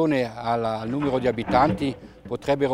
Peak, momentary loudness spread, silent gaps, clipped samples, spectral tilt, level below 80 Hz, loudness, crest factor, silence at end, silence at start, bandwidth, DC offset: -4 dBFS; 10 LU; none; under 0.1%; -7 dB/octave; -48 dBFS; -24 LUFS; 18 dB; 0 s; 0 s; 12.5 kHz; under 0.1%